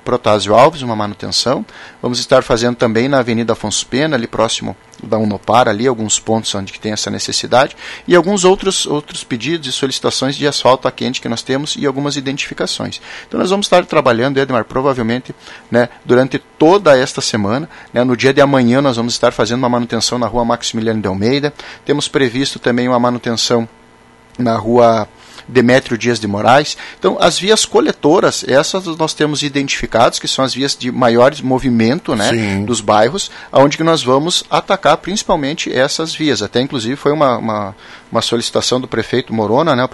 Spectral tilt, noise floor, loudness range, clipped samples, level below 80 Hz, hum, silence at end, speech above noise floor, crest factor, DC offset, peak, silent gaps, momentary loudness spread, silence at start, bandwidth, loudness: -4 dB/octave; -44 dBFS; 3 LU; 0.1%; -44 dBFS; none; 0.05 s; 30 dB; 14 dB; under 0.1%; 0 dBFS; none; 9 LU; 0.05 s; 12 kHz; -14 LUFS